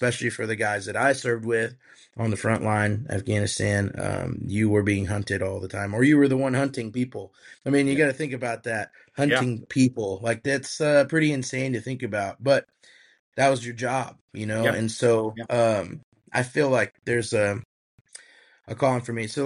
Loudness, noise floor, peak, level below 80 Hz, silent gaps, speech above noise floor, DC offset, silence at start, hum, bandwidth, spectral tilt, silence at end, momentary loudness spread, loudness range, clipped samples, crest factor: -24 LUFS; -55 dBFS; -8 dBFS; -58 dBFS; 13.19-13.32 s, 14.21-14.28 s, 16.04-16.12 s, 17.65-18.05 s; 31 dB; under 0.1%; 0 s; none; 11.5 kHz; -5.5 dB/octave; 0 s; 9 LU; 2 LU; under 0.1%; 18 dB